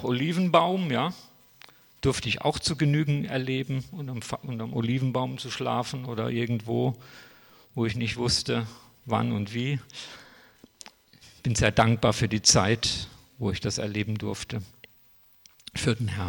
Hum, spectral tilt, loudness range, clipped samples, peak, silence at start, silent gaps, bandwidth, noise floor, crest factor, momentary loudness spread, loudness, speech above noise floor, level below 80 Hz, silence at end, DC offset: none; -4.5 dB/octave; 6 LU; under 0.1%; -6 dBFS; 0 s; none; 17 kHz; -58 dBFS; 22 dB; 18 LU; -27 LUFS; 32 dB; -50 dBFS; 0 s; under 0.1%